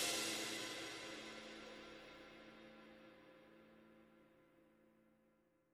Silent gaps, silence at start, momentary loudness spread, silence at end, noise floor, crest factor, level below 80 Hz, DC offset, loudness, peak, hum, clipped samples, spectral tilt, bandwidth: none; 0 s; 24 LU; 0.6 s; -78 dBFS; 22 dB; -80 dBFS; under 0.1%; -47 LUFS; -28 dBFS; none; under 0.1%; -1 dB/octave; 19 kHz